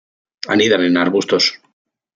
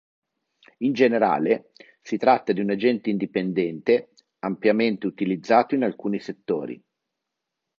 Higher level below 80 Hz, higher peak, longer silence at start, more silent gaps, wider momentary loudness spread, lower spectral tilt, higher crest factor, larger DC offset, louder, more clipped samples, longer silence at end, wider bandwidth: first, -64 dBFS vs -70 dBFS; about the same, -2 dBFS vs -2 dBFS; second, 0.45 s vs 0.8 s; neither; second, 5 LU vs 9 LU; second, -4 dB/octave vs -7 dB/octave; about the same, 16 dB vs 20 dB; neither; first, -15 LUFS vs -23 LUFS; neither; second, 0.6 s vs 1.05 s; about the same, 7.8 kHz vs 7.2 kHz